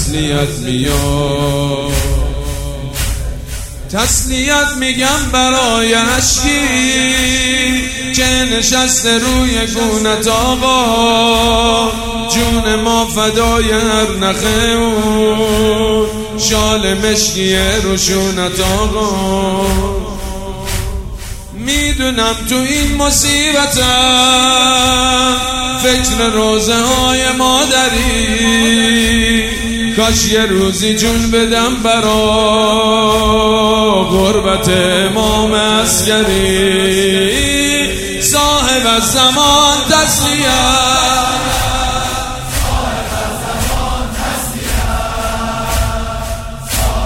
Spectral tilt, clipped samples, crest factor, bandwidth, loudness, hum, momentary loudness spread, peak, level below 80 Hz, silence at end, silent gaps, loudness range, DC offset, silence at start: -3 dB/octave; under 0.1%; 12 dB; 16.5 kHz; -12 LUFS; none; 9 LU; 0 dBFS; -24 dBFS; 0 s; none; 7 LU; under 0.1%; 0 s